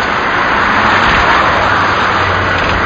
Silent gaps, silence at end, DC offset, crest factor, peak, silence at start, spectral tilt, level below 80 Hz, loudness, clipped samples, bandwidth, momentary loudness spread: none; 0 s; under 0.1%; 10 dB; 0 dBFS; 0 s; -2 dB/octave; -28 dBFS; -10 LUFS; under 0.1%; 8 kHz; 3 LU